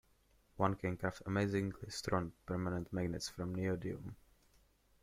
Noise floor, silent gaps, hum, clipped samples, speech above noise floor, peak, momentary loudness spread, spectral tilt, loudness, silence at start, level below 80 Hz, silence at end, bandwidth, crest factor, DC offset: -71 dBFS; none; none; under 0.1%; 33 dB; -18 dBFS; 7 LU; -6 dB/octave; -40 LUFS; 0.55 s; -62 dBFS; 0.85 s; 15.5 kHz; 22 dB; under 0.1%